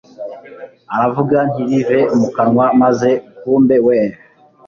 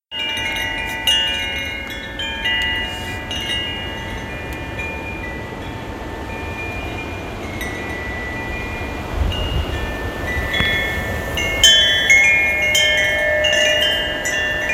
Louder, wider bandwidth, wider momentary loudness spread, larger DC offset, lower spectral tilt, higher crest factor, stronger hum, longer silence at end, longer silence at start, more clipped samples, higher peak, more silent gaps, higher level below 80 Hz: first, -14 LUFS vs -18 LUFS; second, 7.2 kHz vs 16.5 kHz; second, 12 LU vs 16 LU; neither; first, -8 dB/octave vs -2 dB/octave; second, 12 dB vs 20 dB; neither; first, 0.5 s vs 0 s; about the same, 0.2 s vs 0.1 s; neither; about the same, -2 dBFS vs 0 dBFS; neither; second, -54 dBFS vs -32 dBFS